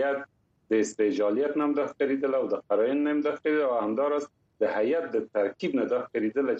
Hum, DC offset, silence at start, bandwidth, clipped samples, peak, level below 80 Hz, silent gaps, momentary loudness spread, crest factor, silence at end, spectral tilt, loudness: none; under 0.1%; 0 s; 8.4 kHz; under 0.1%; -14 dBFS; -76 dBFS; none; 4 LU; 14 dB; 0 s; -5.5 dB/octave; -27 LUFS